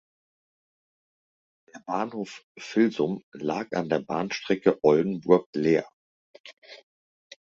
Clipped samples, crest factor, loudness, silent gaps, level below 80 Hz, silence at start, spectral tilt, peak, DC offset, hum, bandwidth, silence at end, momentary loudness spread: under 0.1%; 22 dB; -26 LUFS; 2.43-2.55 s, 3.23-3.32 s, 5.46-5.53 s, 5.93-6.34 s, 6.40-6.44 s, 6.53-6.62 s; -68 dBFS; 1.75 s; -6.5 dB/octave; -4 dBFS; under 0.1%; none; 7.6 kHz; 0.8 s; 13 LU